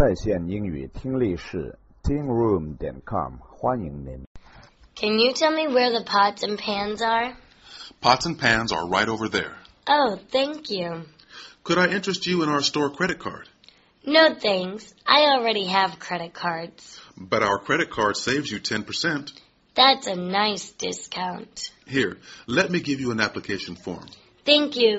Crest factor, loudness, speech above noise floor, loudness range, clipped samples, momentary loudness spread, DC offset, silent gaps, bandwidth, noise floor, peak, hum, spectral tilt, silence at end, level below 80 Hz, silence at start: 22 dB; -23 LUFS; 32 dB; 6 LU; under 0.1%; 16 LU; under 0.1%; 4.27-4.35 s; 8 kHz; -56 dBFS; -2 dBFS; none; -2 dB/octave; 0 s; -48 dBFS; 0 s